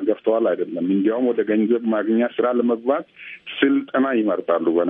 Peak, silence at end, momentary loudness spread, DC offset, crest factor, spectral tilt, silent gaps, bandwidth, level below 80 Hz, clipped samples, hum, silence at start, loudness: -2 dBFS; 0 s; 4 LU; under 0.1%; 18 dB; -10 dB/octave; none; 3.8 kHz; -72 dBFS; under 0.1%; none; 0 s; -20 LUFS